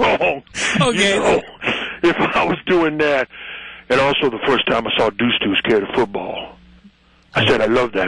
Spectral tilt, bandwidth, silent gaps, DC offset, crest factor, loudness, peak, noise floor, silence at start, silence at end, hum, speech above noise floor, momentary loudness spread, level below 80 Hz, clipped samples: -4 dB/octave; 11 kHz; none; under 0.1%; 14 dB; -17 LUFS; -4 dBFS; -50 dBFS; 0 s; 0 s; none; 33 dB; 11 LU; -46 dBFS; under 0.1%